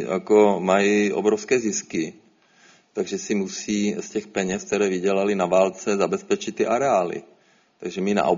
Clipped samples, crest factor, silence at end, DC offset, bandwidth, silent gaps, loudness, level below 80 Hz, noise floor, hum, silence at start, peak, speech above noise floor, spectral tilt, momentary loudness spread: under 0.1%; 18 dB; 0 s; under 0.1%; 7.6 kHz; none; -22 LUFS; -62 dBFS; -56 dBFS; none; 0 s; -4 dBFS; 34 dB; -4.5 dB/octave; 11 LU